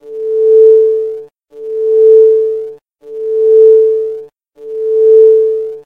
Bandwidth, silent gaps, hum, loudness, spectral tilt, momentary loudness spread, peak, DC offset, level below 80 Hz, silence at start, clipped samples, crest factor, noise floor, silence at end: 1.5 kHz; none; none; -9 LUFS; -6.5 dB/octave; 19 LU; 0 dBFS; under 0.1%; -58 dBFS; 0.05 s; under 0.1%; 10 dB; -32 dBFS; 0.05 s